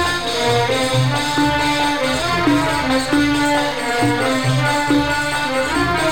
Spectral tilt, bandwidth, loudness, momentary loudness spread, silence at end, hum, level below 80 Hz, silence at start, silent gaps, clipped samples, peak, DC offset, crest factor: -4.5 dB/octave; 17.5 kHz; -17 LUFS; 2 LU; 0 s; none; -38 dBFS; 0 s; none; under 0.1%; -4 dBFS; 1%; 12 dB